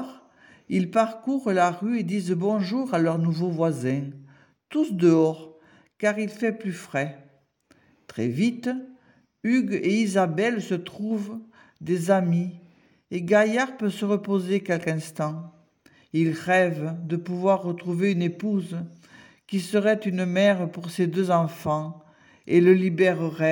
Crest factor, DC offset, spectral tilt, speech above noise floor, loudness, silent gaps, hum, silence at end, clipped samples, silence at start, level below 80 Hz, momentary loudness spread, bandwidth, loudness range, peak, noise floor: 18 dB; under 0.1%; -7 dB/octave; 38 dB; -24 LUFS; none; none; 0 s; under 0.1%; 0 s; -74 dBFS; 10 LU; 17 kHz; 3 LU; -6 dBFS; -62 dBFS